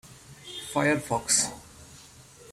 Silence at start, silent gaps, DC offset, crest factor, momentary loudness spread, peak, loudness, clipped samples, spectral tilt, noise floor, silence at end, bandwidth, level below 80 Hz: 0.05 s; none; under 0.1%; 22 dB; 24 LU; -8 dBFS; -25 LUFS; under 0.1%; -2.5 dB/octave; -51 dBFS; 0 s; 16 kHz; -58 dBFS